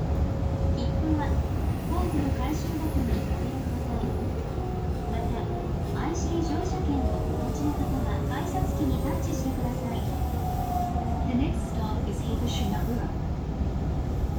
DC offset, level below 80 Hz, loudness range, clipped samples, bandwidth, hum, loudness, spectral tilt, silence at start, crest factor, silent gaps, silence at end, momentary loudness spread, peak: under 0.1%; -32 dBFS; 2 LU; under 0.1%; over 20 kHz; none; -29 LUFS; -7 dB/octave; 0 s; 14 dB; none; 0 s; 3 LU; -14 dBFS